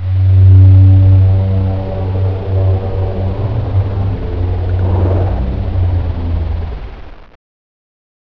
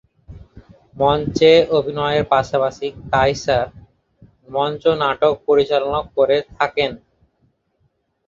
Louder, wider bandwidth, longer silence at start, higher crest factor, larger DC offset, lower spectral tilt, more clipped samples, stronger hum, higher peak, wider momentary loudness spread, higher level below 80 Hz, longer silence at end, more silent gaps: first, -13 LUFS vs -18 LUFS; second, 4 kHz vs 7.4 kHz; second, 0 s vs 0.3 s; second, 12 dB vs 18 dB; first, 1% vs under 0.1%; first, -11 dB/octave vs -5.5 dB/octave; first, 0.2% vs under 0.1%; neither; about the same, 0 dBFS vs -2 dBFS; first, 12 LU vs 8 LU; first, -22 dBFS vs -44 dBFS; second, 1.15 s vs 1.3 s; neither